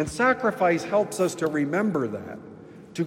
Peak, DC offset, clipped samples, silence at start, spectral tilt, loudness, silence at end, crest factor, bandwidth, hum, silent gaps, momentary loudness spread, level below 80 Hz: -8 dBFS; under 0.1%; under 0.1%; 0 s; -5.5 dB/octave; -24 LUFS; 0 s; 16 dB; 16 kHz; none; none; 17 LU; -58 dBFS